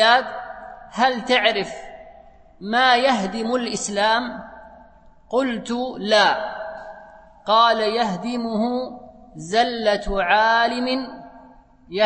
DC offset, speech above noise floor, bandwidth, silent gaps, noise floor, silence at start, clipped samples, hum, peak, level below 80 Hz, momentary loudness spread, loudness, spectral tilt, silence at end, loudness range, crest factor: under 0.1%; 29 dB; 8.8 kHz; none; -49 dBFS; 0 s; under 0.1%; none; -2 dBFS; -46 dBFS; 21 LU; -20 LUFS; -3 dB/octave; 0 s; 2 LU; 18 dB